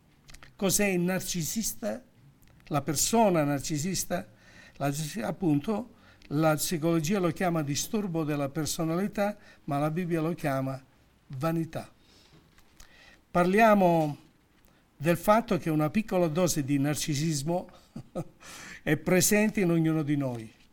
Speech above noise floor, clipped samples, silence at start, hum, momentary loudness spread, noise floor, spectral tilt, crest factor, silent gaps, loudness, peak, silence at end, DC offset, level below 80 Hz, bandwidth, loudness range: 35 dB; under 0.1%; 0.3 s; none; 14 LU; -62 dBFS; -5 dB/octave; 20 dB; none; -28 LUFS; -8 dBFS; 0.25 s; under 0.1%; -54 dBFS; 18 kHz; 5 LU